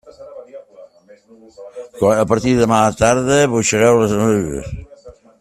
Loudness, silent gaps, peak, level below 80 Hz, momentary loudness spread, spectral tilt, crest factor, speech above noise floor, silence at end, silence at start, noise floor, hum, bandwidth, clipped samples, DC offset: -15 LUFS; none; 0 dBFS; -42 dBFS; 23 LU; -5 dB/octave; 16 dB; 29 dB; 0.3 s; 0.2 s; -44 dBFS; none; 14 kHz; under 0.1%; under 0.1%